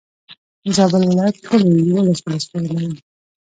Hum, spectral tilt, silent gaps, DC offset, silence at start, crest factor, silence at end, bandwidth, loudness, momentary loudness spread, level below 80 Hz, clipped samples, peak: none; -6.5 dB/octave; 0.37-0.62 s; under 0.1%; 0.3 s; 16 dB; 0.5 s; 9.4 kHz; -17 LUFS; 11 LU; -58 dBFS; under 0.1%; 0 dBFS